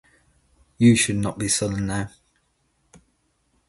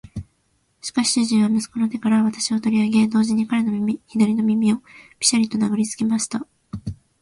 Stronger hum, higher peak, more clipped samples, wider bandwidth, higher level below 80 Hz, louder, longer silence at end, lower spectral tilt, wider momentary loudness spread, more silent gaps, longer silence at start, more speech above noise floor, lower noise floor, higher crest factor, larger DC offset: neither; second, -6 dBFS vs -2 dBFS; neither; about the same, 11.5 kHz vs 11.5 kHz; about the same, -48 dBFS vs -52 dBFS; about the same, -21 LUFS vs -20 LUFS; first, 1.6 s vs 0.3 s; about the same, -4.5 dB/octave vs -4 dB/octave; second, 12 LU vs 15 LU; neither; first, 0.8 s vs 0.05 s; about the same, 48 dB vs 46 dB; about the same, -68 dBFS vs -66 dBFS; about the same, 20 dB vs 20 dB; neither